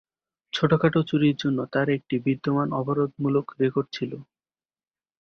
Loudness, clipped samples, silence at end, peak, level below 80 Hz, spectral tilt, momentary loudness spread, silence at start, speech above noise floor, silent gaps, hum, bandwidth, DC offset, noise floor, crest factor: -25 LUFS; under 0.1%; 1 s; -6 dBFS; -62 dBFS; -7.5 dB/octave; 10 LU; 0.55 s; over 66 dB; none; none; 7 kHz; under 0.1%; under -90 dBFS; 20 dB